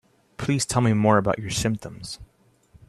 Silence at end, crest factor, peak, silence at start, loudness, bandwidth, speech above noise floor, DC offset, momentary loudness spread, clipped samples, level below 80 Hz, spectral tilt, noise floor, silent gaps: 0.65 s; 20 dB; -4 dBFS; 0.4 s; -23 LUFS; 13.5 kHz; 34 dB; under 0.1%; 17 LU; under 0.1%; -48 dBFS; -5 dB/octave; -57 dBFS; none